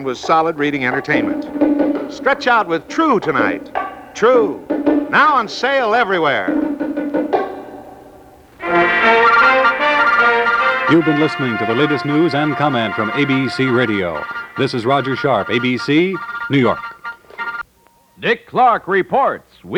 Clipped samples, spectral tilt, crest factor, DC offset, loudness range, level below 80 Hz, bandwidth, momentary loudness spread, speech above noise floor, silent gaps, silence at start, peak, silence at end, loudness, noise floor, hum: under 0.1%; -6 dB/octave; 14 dB; under 0.1%; 6 LU; -54 dBFS; 10.5 kHz; 12 LU; 37 dB; none; 0 s; -2 dBFS; 0 s; -15 LUFS; -53 dBFS; none